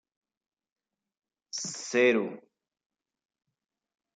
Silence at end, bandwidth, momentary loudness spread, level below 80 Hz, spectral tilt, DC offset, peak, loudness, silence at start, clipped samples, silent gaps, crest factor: 1.75 s; 9.4 kHz; 14 LU; under -90 dBFS; -3 dB/octave; under 0.1%; -12 dBFS; -28 LUFS; 1.55 s; under 0.1%; none; 22 dB